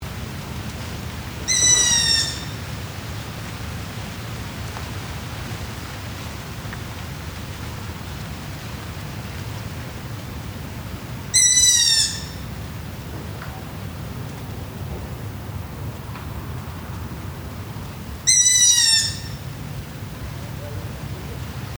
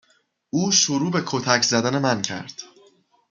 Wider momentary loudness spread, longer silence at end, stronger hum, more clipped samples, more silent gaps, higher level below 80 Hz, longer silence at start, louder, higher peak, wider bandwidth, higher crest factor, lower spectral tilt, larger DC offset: first, 19 LU vs 14 LU; second, 0 s vs 0.65 s; neither; neither; neither; first, -40 dBFS vs -66 dBFS; second, 0 s vs 0.55 s; about the same, -20 LUFS vs -20 LUFS; about the same, -2 dBFS vs -2 dBFS; first, over 20 kHz vs 11 kHz; about the same, 22 dB vs 22 dB; second, -1.5 dB/octave vs -3 dB/octave; neither